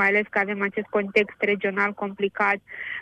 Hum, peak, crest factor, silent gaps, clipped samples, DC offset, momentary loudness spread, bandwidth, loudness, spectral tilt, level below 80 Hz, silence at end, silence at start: none; -6 dBFS; 18 dB; none; under 0.1%; under 0.1%; 6 LU; 8.8 kHz; -24 LUFS; -6.5 dB/octave; -68 dBFS; 0 s; 0 s